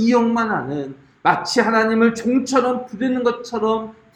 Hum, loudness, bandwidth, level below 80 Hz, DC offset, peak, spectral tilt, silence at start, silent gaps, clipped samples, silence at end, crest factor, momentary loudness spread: none; -19 LUFS; 11.5 kHz; -58 dBFS; under 0.1%; -2 dBFS; -5 dB/octave; 0 s; none; under 0.1%; 0.25 s; 18 dB; 8 LU